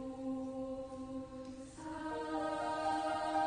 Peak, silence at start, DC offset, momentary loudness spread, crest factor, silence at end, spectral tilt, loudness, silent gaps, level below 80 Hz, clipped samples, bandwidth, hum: -24 dBFS; 0 s; under 0.1%; 12 LU; 16 dB; 0 s; -5 dB/octave; -41 LUFS; none; -64 dBFS; under 0.1%; 9.6 kHz; none